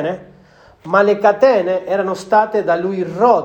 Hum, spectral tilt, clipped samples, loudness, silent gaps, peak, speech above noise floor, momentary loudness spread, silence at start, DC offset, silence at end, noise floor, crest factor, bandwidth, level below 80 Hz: none; -6 dB/octave; under 0.1%; -15 LUFS; none; 0 dBFS; 32 dB; 8 LU; 0 s; under 0.1%; 0 s; -46 dBFS; 14 dB; 9 kHz; -58 dBFS